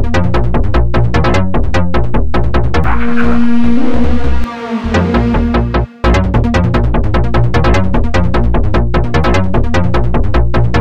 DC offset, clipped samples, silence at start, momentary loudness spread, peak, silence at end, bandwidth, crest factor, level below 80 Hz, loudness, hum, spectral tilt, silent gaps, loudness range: 20%; under 0.1%; 0 s; 3 LU; 0 dBFS; 0 s; 8.4 kHz; 12 dB; -16 dBFS; -13 LUFS; none; -7.5 dB/octave; none; 1 LU